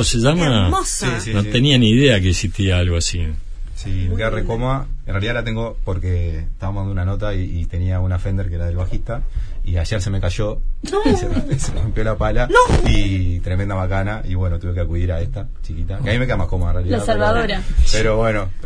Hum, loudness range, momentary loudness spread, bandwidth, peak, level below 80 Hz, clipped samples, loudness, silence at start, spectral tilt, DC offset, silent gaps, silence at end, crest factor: none; 6 LU; 12 LU; 11 kHz; 0 dBFS; -22 dBFS; under 0.1%; -19 LUFS; 0 s; -5.5 dB/octave; under 0.1%; none; 0 s; 16 dB